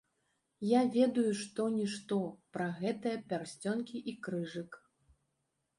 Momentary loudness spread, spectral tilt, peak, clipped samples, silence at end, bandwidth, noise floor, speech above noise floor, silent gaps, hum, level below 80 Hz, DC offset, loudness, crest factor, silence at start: 12 LU; -6 dB/octave; -16 dBFS; under 0.1%; 1 s; 11.5 kHz; -83 dBFS; 48 dB; none; none; -78 dBFS; under 0.1%; -35 LUFS; 18 dB; 0.6 s